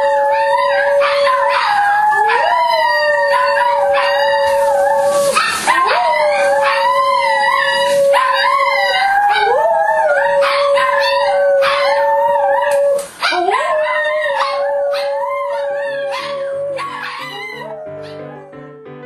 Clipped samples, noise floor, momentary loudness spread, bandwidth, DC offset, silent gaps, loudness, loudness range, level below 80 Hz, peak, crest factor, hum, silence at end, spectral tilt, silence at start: under 0.1%; -34 dBFS; 9 LU; 13.5 kHz; under 0.1%; none; -14 LUFS; 7 LU; -56 dBFS; 0 dBFS; 14 dB; none; 0 s; -1.5 dB/octave; 0 s